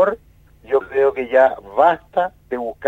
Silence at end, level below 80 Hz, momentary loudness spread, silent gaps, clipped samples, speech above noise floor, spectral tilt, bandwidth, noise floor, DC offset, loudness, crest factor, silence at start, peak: 0 s; -52 dBFS; 11 LU; none; under 0.1%; 31 dB; -6.5 dB/octave; 7.6 kHz; -49 dBFS; under 0.1%; -18 LUFS; 16 dB; 0 s; -2 dBFS